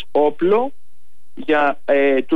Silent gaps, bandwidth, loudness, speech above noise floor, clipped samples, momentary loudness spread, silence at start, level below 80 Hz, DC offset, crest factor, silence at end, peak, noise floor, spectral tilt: none; 5.2 kHz; -18 LUFS; 47 dB; under 0.1%; 8 LU; 0.15 s; -64 dBFS; 5%; 12 dB; 0 s; -6 dBFS; -63 dBFS; -7 dB/octave